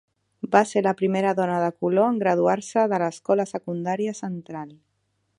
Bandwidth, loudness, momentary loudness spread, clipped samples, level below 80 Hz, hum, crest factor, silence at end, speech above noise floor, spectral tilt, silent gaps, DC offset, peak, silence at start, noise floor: 11 kHz; -23 LUFS; 13 LU; under 0.1%; -72 dBFS; none; 22 dB; 0.65 s; 50 dB; -6.5 dB/octave; none; under 0.1%; -2 dBFS; 0.45 s; -72 dBFS